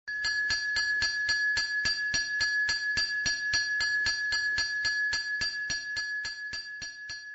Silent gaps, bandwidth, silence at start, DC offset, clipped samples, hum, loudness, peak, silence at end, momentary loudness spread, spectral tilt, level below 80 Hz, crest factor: none; 8.2 kHz; 0.05 s; under 0.1%; under 0.1%; none; -28 LUFS; -16 dBFS; 0 s; 8 LU; 1 dB/octave; -56 dBFS; 14 dB